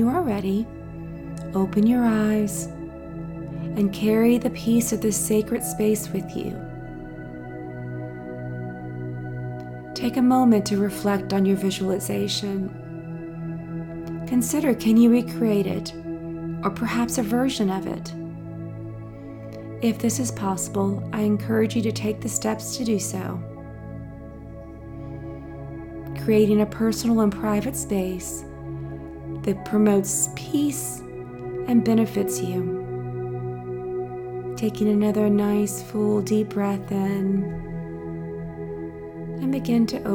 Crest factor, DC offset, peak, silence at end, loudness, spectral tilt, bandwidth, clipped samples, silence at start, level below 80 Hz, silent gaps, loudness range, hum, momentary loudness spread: 16 dB; under 0.1%; -8 dBFS; 0 s; -24 LUFS; -5.5 dB/octave; 18 kHz; under 0.1%; 0 s; -48 dBFS; none; 6 LU; none; 16 LU